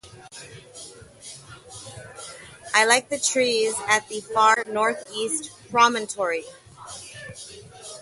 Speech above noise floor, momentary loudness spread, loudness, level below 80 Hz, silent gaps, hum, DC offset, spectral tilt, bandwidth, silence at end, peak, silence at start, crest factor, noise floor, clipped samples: 20 dB; 23 LU; -22 LUFS; -62 dBFS; none; none; under 0.1%; -1 dB/octave; 12 kHz; 0 s; -2 dBFS; 0.05 s; 24 dB; -44 dBFS; under 0.1%